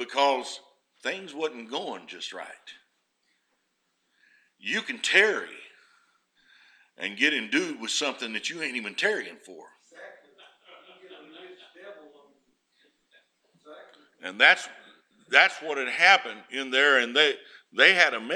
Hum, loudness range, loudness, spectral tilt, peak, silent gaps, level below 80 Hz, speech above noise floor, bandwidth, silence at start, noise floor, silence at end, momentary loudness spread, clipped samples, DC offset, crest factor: none; 15 LU; -23 LUFS; -1 dB/octave; -2 dBFS; none; -90 dBFS; 50 dB; 14 kHz; 0 s; -75 dBFS; 0 s; 19 LU; under 0.1%; under 0.1%; 26 dB